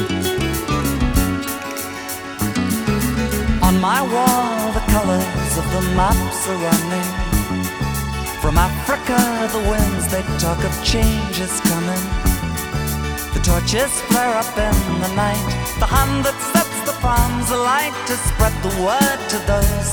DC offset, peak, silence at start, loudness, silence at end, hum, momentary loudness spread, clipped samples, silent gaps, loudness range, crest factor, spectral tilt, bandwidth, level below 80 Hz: under 0.1%; -2 dBFS; 0 s; -19 LUFS; 0 s; none; 6 LU; under 0.1%; none; 2 LU; 16 dB; -4.5 dB/octave; over 20 kHz; -24 dBFS